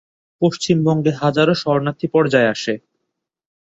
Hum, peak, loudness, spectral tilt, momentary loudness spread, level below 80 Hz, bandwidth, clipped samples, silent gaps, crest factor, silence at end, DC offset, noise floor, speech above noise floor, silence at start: none; -2 dBFS; -17 LUFS; -6 dB/octave; 6 LU; -58 dBFS; 8 kHz; under 0.1%; none; 16 dB; 0.85 s; under 0.1%; -77 dBFS; 60 dB; 0.4 s